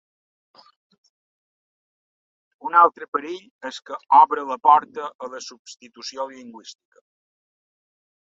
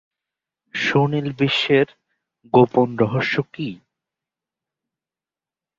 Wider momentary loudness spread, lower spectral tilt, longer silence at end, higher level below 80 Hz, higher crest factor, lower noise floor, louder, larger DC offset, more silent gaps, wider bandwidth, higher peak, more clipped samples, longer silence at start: first, 24 LU vs 13 LU; second, -2 dB/octave vs -6.5 dB/octave; second, 1.6 s vs 2.05 s; second, -80 dBFS vs -60 dBFS; about the same, 22 dB vs 20 dB; about the same, under -90 dBFS vs under -90 dBFS; about the same, -19 LUFS vs -19 LUFS; neither; first, 3.08-3.12 s, 3.51-3.59 s, 5.15-5.19 s, 5.59-5.65 s vs none; about the same, 7.8 kHz vs 7.6 kHz; about the same, -2 dBFS vs -2 dBFS; neither; first, 2.65 s vs 0.75 s